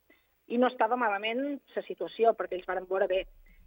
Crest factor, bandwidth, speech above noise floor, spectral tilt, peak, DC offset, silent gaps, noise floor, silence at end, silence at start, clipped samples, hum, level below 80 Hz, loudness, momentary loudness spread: 18 dB; 16.5 kHz; 35 dB; -6.5 dB/octave; -12 dBFS; under 0.1%; none; -64 dBFS; 0.4 s; 0.5 s; under 0.1%; none; -62 dBFS; -30 LUFS; 11 LU